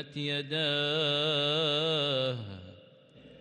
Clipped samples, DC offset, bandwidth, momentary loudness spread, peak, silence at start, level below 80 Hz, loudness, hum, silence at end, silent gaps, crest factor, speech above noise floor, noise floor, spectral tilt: under 0.1%; under 0.1%; 10 kHz; 10 LU; -16 dBFS; 0 s; -74 dBFS; -28 LUFS; none; 0 s; none; 14 dB; 26 dB; -56 dBFS; -5 dB/octave